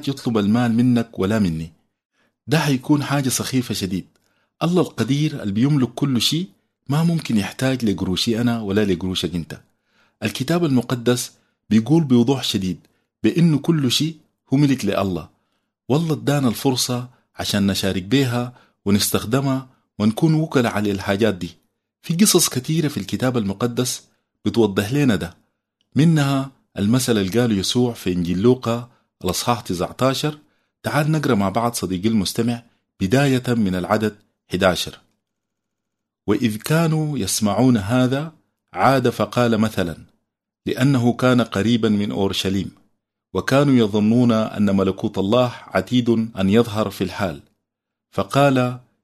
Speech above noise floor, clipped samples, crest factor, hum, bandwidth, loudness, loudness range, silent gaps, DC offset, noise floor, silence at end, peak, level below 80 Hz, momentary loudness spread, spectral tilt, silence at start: 63 dB; under 0.1%; 18 dB; none; 13.5 kHz; -20 LUFS; 3 LU; 2.05-2.10 s; under 0.1%; -82 dBFS; 0.25 s; -2 dBFS; -54 dBFS; 10 LU; -5.5 dB/octave; 0 s